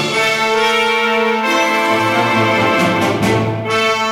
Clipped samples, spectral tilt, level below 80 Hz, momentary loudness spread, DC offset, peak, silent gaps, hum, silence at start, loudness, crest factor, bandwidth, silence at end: under 0.1%; -4 dB/octave; -48 dBFS; 2 LU; under 0.1%; -4 dBFS; none; none; 0 s; -14 LUFS; 12 dB; 20 kHz; 0 s